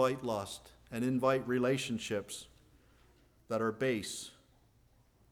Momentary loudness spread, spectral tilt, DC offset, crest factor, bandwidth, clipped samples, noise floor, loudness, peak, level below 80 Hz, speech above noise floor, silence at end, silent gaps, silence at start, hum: 15 LU; -5 dB/octave; under 0.1%; 20 dB; 19 kHz; under 0.1%; -67 dBFS; -35 LUFS; -16 dBFS; -66 dBFS; 33 dB; 1 s; none; 0 s; none